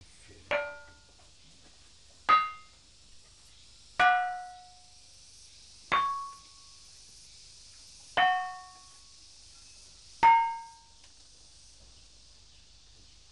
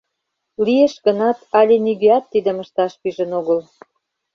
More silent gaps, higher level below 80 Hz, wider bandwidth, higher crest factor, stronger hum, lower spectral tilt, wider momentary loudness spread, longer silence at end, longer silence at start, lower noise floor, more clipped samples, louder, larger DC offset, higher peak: neither; about the same, -64 dBFS vs -64 dBFS; first, 11.5 kHz vs 6.8 kHz; first, 22 dB vs 16 dB; neither; second, -1.5 dB/octave vs -6.5 dB/octave; first, 27 LU vs 8 LU; first, 2.6 s vs 0.75 s; about the same, 0.5 s vs 0.6 s; second, -58 dBFS vs -76 dBFS; neither; second, -28 LUFS vs -17 LUFS; neither; second, -12 dBFS vs -2 dBFS